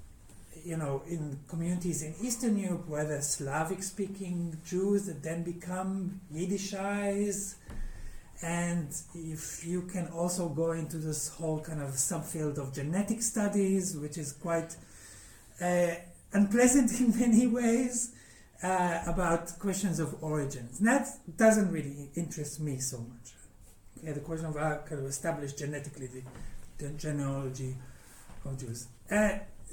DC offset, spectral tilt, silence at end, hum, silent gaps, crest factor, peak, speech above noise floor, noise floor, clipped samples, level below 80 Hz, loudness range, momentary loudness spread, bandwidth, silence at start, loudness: under 0.1%; -5 dB/octave; 0 s; none; none; 20 dB; -12 dBFS; 23 dB; -54 dBFS; under 0.1%; -50 dBFS; 10 LU; 16 LU; 17.5 kHz; 0 s; -32 LUFS